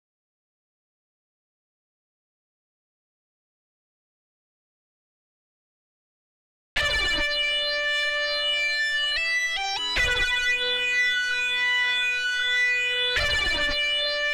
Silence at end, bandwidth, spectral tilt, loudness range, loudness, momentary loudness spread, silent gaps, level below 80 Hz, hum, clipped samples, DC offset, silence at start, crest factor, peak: 0 s; 18 kHz; -0.5 dB/octave; 6 LU; -22 LUFS; 2 LU; none; -44 dBFS; none; under 0.1%; under 0.1%; 6.75 s; 16 dB; -12 dBFS